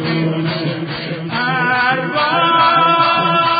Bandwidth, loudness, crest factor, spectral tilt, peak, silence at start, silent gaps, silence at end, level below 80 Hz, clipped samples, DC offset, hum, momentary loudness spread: 5 kHz; -14 LUFS; 14 dB; -10.5 dB/octave; -2 dBFS; 0 s; none; 0 s; -54 dBFS; under 0.1%; under 0.1%; none; 10 LU